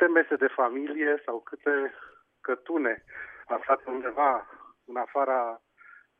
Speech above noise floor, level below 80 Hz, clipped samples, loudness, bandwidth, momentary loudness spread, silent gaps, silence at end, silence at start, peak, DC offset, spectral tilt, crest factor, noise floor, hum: 27 dB; -74 dBFS; under 0.1%; -28 LUFS; 3.7 kHz; 13 LU; none; 0.6 s; 0 s; -8 dBFS; under 0.1%; -7 dB/octave; 20 dB; -55 dBFS; none